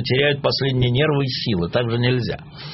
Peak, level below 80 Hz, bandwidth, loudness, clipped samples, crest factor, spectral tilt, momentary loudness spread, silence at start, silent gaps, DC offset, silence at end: -2 dBFS; -44 dBFS; 6 kHz; -20 LUFS; under 0.1%; 16 dB; -4.5 dB/octave; 5 LU; 0 s; none; under 0.1%; 0 s